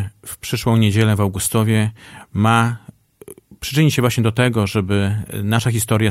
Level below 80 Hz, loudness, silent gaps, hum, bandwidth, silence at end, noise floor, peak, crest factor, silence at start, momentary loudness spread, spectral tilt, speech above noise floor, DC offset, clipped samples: -46 dBFS; -18 LUFS; none; none; 15.5 kHz; 0 s; -42 dBFS; -2 dBFS; 16 dB; 0 s; 9 LU; -5.5 dB/octave; 25 dB; under 0.1%; under 0.1%